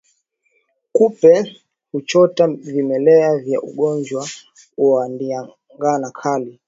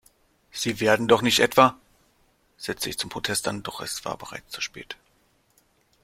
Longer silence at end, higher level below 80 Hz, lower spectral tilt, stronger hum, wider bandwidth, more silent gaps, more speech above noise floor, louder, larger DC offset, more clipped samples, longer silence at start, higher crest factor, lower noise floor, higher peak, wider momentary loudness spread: second, 0.15 s vs 1.1 s; second, -66 dBFS vs -58 dBFS; first, -6 dB/octave vs -3 dB/octave; neither; second, 7.8 kHz vs 16.5 kHz; neither; first, 49 dB vs 41 dB; first, -17 LUFS vs -24 LUFS; neither; neither; first, 0.95 s vs 0.55 s; second, 16 dB vs 24 dB; about the same, -65 dBFS vs -65 dBFS; about the same, 0 dBFS vs -2 dBFS; second, 15 LU vs 18 LU